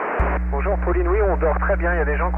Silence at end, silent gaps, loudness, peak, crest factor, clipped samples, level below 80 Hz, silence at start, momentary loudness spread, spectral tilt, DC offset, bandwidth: 0 s; none; -21 LUFS; -8 dBFS; 12 dB; under 0.1%; -22 dBFS; 0 s; 3 LU; -10.5 dB/octave; under 0.1%; 3.1 kHz